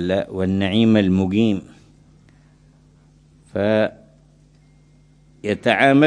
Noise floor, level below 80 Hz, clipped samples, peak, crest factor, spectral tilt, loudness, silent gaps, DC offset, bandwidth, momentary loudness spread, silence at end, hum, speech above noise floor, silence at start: -52 dBFS; -56 dBFS; under 0.1%; 0 dBFS; 20 dB; -7 dB/octave; -19 LUFS; none; under 0.1%; 10 kHz; 11 LU; 0 s; none; 35 dB; 0 s